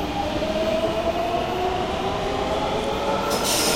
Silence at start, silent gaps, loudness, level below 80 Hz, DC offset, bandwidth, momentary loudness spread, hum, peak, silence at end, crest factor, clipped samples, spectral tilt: 0 s; none; -23 LUFS; -38 dBFS; under 0.1%; 16 kHz; 3 LU; none; -8 dBFS; 0 s; 14 dB; under 0.1%; -3.5 dB/octave